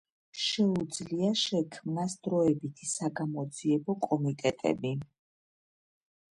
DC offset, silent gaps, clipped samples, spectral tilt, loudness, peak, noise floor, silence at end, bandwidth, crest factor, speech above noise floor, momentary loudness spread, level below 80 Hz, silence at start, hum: under 0.1%; none; under 0.1%; -5 dB/octave; -31 LUFS; -14 dBFS; under -90 dBFS; 1.35 s; 11.5 kHz; 18 dB; over 60 dB; 7 LU; -70 dBFS; 0.35 s; none